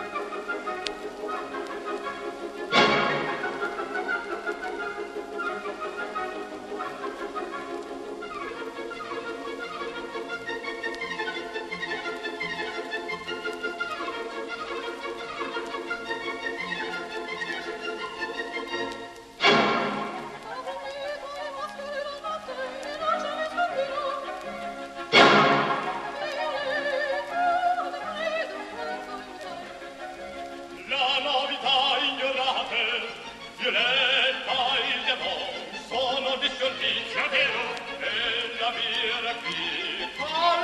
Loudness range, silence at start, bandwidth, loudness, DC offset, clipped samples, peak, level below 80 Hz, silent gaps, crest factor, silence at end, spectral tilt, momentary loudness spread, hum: 10 LU; 0 s; 13 kHz; -27 LUFS; under 0.1%; under 0.1%; -4 dBFS; -62 dBFS; none; 24 dB; 0 s; -3 dB/octave; 14 LU; none